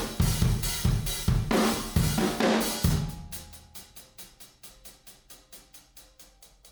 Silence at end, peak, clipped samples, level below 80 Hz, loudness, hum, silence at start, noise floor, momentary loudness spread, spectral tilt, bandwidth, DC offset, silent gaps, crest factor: 0.25 s; -12 dBFS; under 0.1%; -36 dBFS; -27 LUFS; none; 0 s; -54 dBFS; 23 LU; -5 dB/octave; over 20 kHz; under 0.1%; none; 18 dB